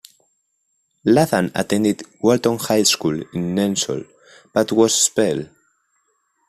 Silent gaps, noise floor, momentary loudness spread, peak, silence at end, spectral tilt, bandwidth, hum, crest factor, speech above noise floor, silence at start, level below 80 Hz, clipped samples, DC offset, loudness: none; -70 dBFS; 9 LU; -2 dBFS; 1.05 s; -4 dB/octave; 15 kHz; none; 18 dB; 51 dB; 1.05 s; -56 dBFS; under 0.1%; under 0.1%; -18 LUFS